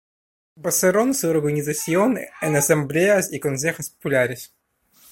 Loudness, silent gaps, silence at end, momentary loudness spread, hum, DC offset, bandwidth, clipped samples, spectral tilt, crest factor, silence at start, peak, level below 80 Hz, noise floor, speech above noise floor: -21 LUFS; none; 0.65 s; 7 LU; none; under 0.1%; 16.5 kHz; under 0.1%; -4.5 dB/octave; 18 dB; 0.6 s; -4 dBFS; -60 dBFS; -56 dBFS; 36 dB